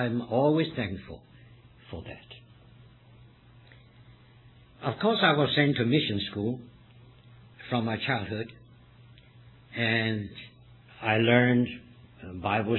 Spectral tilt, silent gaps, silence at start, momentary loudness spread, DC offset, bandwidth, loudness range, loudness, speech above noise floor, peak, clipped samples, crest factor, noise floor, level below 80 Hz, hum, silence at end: -9 dB/octave; none; 0 s; 22 LU; under 0.1%; 4.3 kHz; 17 LU; -27 LUFS; 28 dB; -8 dBFS; under 0.1%; 22 dB; -55 dBFS; -60 dBFS; none; 0 s